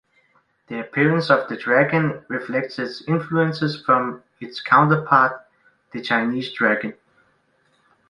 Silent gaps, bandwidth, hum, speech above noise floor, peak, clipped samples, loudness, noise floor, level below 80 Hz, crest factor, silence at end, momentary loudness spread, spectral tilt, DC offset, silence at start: none; 10.5 kHz; none; 43 dB; -2 dBFS; under 0.1%; -20 LUFS; -63 dBFS; -64 dBFS; 20 dB; 1.15 s; 16 LU; -7.5 dB/octave; under 0.1%; 0.7 s